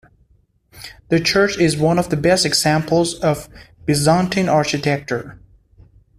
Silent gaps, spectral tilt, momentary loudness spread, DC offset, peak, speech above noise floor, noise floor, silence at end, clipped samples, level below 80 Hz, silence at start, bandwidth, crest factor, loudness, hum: none; -4.5 dB/octave; 12 LU; under 0.1%; -2 dBFS; 41 dB; -58 dBFS; 0.85 s; under 0.1%; -46 dBFS; 0.75 s; 15 kHz; 16 dB; -17 LUFS; none